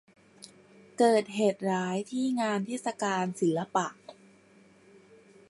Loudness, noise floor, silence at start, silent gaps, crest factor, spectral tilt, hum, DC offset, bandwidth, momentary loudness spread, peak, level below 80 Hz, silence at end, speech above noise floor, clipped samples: -29 LUFS; -59 dBFS; 0.45 s; none; 20 dB; -5.5 dB/octave; none; under 0.1%; 11.5 kHz; 9 LU; -12 dBFS; -80 dBFS; 1.35 s; 31 dB; under 0.1%